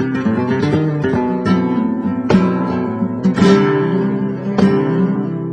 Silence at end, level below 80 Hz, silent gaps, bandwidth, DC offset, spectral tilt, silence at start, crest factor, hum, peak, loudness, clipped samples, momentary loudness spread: 0 s; -46 dBFS; none; 8.6 kHz; under 0.1%; -8 dB/octave; 0 s; 14 dB; none; 0 dBFS; -16 LUFS; under 0.1%; 7 LU